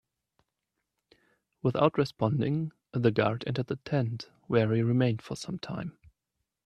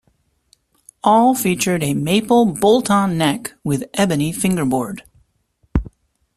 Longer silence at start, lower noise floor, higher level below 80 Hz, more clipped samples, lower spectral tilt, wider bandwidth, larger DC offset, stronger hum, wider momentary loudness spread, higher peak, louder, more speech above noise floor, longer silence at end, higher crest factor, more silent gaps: first, 1.65 s vs 1.05 s; first, -84 dBFS vs -63 dBFS; second, -64 dBFS vs -38 dBFS; neither; first, -7.5 dB/octave vs -5 dB/octave; second, 11 kHz vs 14.5 kHz; neither; neither; about the same, 11 LU vs 11 LU; second, -8 dBFS vs -2 dBFS; second, -29 LUFS vs -17 LUFS; first, 56 dB vs 46 dB; first, 0.75 s vs 0.5 s; first, 22 dB vs 16 dB; neither